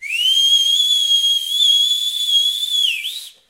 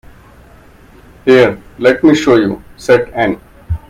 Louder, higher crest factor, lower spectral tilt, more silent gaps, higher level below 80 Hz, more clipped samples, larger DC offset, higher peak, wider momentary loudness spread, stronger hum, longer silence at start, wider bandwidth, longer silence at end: about the same, -13 LUFS vs -12 LUFS; about the same, 12 dB vs 14 dB; second, 6.5 dB/octave vs -6 dB/octave; neither; second, -68 dBFS vs -36 dBFS; second, under 0.1% vs 0.1%; neither; second, -4 dBFS vs 0 dBFS; second, 5 LU vs 12 LU; neither; second, 0 s vs 1.25 s; first, 16 kHz vs 14.5 kHz; about the same, 0.2 s vs 0.1 s